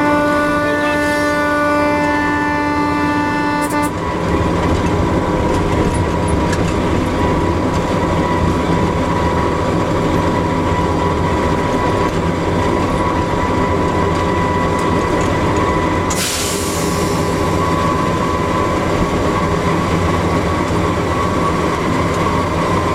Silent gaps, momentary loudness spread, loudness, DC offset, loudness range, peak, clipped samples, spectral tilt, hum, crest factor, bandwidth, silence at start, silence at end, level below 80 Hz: none; 2 LU; -16 LUFS; under 0.1%; 1 LU; -2 dBFS; under 0.1%; -5.5 dB/octave; none; 14 dB; 16 kHz; 0 s; 0 s; -28 dBFS